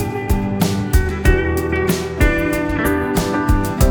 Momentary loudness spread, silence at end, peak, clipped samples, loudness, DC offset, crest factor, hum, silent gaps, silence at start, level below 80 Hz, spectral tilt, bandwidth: 3 LU; 0 s; 0 dBFS; under 0.1%; -18 LUFS; under 0.1%; 16 dB; none; none; 0 s; -22 dBFS; -6 dB/octave; over 20 kHz